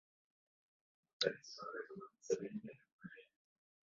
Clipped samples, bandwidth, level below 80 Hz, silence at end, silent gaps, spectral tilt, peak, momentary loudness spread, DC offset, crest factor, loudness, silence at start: under 0.1%; 7.4 kHz; -88 dBFS; 0.65 s; 2.92-2.99 s; -2 dB/octave; -22 dBFS; 18 LU; under 0.1%; 26 dB; -44 LUFS; 1.2 s